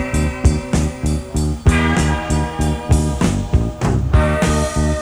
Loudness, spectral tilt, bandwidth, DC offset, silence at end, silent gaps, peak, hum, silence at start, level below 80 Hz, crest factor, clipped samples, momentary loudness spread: -18 LUFS; -6 dB/octave; 13 kHz; under 0.1%; 0 s; none; -2 dBFS; none; 0 s; -20 dBFS; 14 dB; under 0.1%; 5 LU